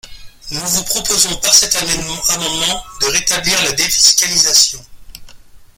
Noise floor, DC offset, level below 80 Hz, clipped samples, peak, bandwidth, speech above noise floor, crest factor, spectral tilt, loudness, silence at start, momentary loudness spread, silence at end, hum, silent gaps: -38 dBFS; under 0.1%; -38 dBFS; under 0.1%; 0 dBFS; over 20 kHz; 23 dB; 16 dB; 0 dB/octave; -12 LUFS; 0.05 s; 9 LU; 0.1 s; none; none